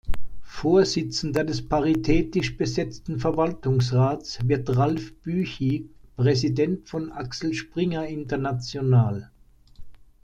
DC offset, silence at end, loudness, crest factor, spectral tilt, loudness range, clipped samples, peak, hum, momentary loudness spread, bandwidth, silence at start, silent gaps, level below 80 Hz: under 0.1%; 0.3 s; -25 LUFS; 16 dB; -6.5 dB/octave; 3 LU; under 0.1%; -8 dBFS; none; 10 LU; 8.8 kHz; 0.05 s; none; -40 dBFS